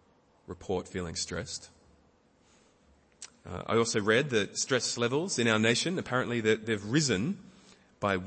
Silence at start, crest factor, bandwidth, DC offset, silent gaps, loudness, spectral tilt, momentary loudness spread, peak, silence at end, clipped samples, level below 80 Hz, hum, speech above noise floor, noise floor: 0.5 s; 22 dB; 8.8 kHz; under 0.1%; none; -29 LUFS; -4 dB/octave; 16 LU; -10 dBFS; 0 s; under 0.1%; -62 dBFS; none; 35 dB; -65 dBFS